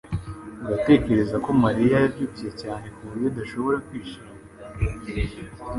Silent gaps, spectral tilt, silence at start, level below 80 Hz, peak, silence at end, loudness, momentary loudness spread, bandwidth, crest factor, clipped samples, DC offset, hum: none; -8 dB/octave; 0.05 s; -38 dBFS; -4 dBFS; 0 s; -24 LUFS; 19 LU; 11.5 kHz; 20 dB; under 0.1%; under 0.1%; none